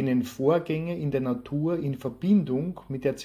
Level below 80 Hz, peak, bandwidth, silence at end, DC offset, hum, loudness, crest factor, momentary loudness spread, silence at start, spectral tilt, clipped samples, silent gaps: -58 dBFS; -10 dBFS; 16 kHz; 0 s; under 0.1%; none; -27 LUFS; 16 dB; 7 LU; 0 s; -8 dB/octave; under 0.1%; none